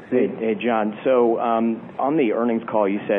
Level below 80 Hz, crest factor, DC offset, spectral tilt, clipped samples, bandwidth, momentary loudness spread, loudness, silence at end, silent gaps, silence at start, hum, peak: -68 dBFS; 14 dB; under 0.1%; -10 dB/octave; under 0.1%; 3.8 kHz; 5 LU; -21 LUFS; 0 s; none; 0 s; none; -6 dBFS